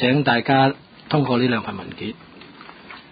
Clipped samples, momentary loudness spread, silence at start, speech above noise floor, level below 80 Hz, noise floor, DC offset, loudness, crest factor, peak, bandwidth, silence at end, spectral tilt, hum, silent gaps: under 0.1%; 23 LU; 0 s; 23 dB; -56 dBFS; -42 dBFS; under 0.1%; -20 LUFS; 18 dB; -4 dBFS; 5 kHz; 0.1 s; -11 dB/octave; none; none